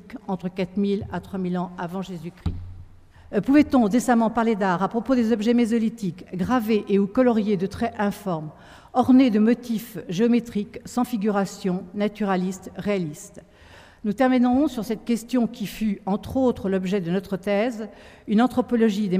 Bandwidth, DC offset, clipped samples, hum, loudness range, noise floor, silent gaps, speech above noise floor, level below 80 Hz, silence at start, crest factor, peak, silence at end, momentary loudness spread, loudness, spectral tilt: 15.5 kHz; under 0.1%; under 0.1%; none; 5 LU; -49 dBFS; none; 26 dB; -48 dBFS; 0.05 s; 18 dB; -4 dBFS; 0 s; 12 LU; -23 LUFS; -6.5 dB/octave